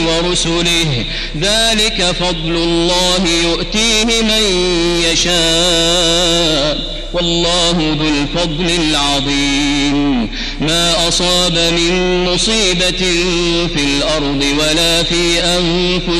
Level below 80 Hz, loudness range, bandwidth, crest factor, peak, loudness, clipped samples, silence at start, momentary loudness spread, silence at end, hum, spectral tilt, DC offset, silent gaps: -24 dBFS; 2 LU; 13 kHz; 12 dB; -2 dBFS; -12 LUFS; under 0.1%; 0 s; 5 LU; 0 s; none; -3 dB/octave; under 0.1%; none